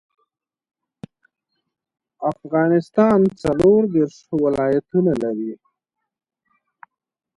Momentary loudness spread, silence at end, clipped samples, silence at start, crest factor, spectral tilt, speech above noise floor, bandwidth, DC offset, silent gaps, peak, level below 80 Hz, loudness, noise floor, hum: 11 LU; 1.8 s; under 0.1%; 2.2 s; 18 dB; -8.5 dB/octave; 61 dB; 11 kHz; under 0.1%; none; -4 dBFS; -52 dBFS; -19 LUFS; -79 dBFS; none